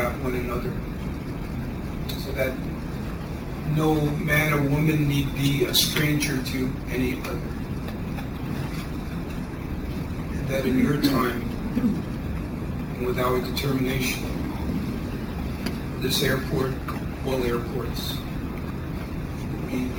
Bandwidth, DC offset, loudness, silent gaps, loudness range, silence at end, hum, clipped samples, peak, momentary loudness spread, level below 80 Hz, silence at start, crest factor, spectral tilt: over 20 kHz; under 0.1%; -26 LUFS; none; 7 LU; 0 s; none; under 0.1%; -4 dBFS; 10 LU; -36 dBFS; 0 s; 22 dB; -5.5 dB/octave